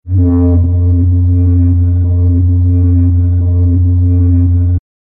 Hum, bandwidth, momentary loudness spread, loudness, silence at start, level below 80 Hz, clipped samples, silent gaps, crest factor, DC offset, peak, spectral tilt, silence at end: none; 1.2 kHz; 2 LU; -11 LUFS; 0.05 s; -20 dBFS; under 0.1%; none; 8 dB; under 0.1%; -2 dBFS; -15.5 dB/octave; 0.25 s